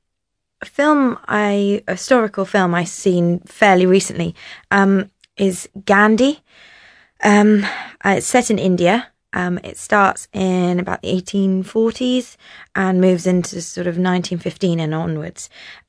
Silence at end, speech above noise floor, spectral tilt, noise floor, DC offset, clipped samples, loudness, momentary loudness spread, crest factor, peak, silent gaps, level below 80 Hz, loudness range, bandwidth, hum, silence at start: 0.15 s; 61 dB; -5.5 dB/octave; -77 dBFS; under 0.1%; under 0.1%; -17 LUFS; 12 LU; 16 dB; 0 dBFS; none; -54 dBFS; 3 LU; 11 kHz; none; 0.6 s